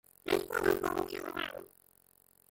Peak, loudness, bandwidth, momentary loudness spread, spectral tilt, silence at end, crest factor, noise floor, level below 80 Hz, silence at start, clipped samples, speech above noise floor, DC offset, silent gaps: -14 dBFS; -34 LUFS; 17 kHz; 9 LU; -4 dB/octave; 0.85 s; 22 dB; -66 dBFS; -62 dBFS; 0.25 s; under 0.1%; 32 dB; under 0.1%; none